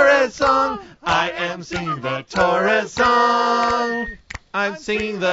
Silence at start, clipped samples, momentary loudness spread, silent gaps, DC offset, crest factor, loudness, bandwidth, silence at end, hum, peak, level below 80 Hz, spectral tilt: 0 s; under 0.1%; 11 LU; none; under 0.1%; 16 dB; -19 LUFS; 8 kHz; 0 s; none; -2 dBFS; -46 dBFS; -4 dB/octave